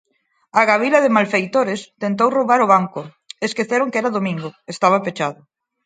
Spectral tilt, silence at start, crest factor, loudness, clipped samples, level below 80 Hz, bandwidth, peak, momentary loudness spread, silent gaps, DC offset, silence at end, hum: -5.5 dB/octave; 0.55 s; 18 dB; -18 LUFS; under 0.1%; -68 dBFS; 9.4 kHz; 0 dBFS; 12 LU; none; under 0.1%; 0.5 s; none